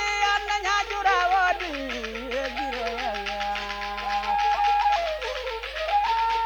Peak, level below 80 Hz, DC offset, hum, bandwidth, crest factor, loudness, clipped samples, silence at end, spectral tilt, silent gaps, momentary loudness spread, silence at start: -12 dBFS; -46 dBFS; under 0.1%; none; over 20 kHz; 14 dB; -25 LUFS; under 0.1%; 0 s; -2 dB/octave; none; 8 LU; 0 s